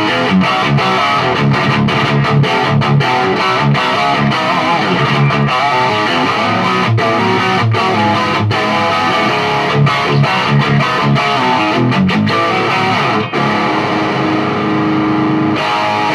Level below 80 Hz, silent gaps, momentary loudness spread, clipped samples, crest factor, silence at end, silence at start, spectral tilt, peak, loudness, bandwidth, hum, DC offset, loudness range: -44 dBFS; none; 2 LU; under 0.1%; 10 dB; 0 s; 0 s; -6 dB/octave; -2 dBFS; -12 LUFS; 12.5 kHz; none; under 0.1%; 1 LU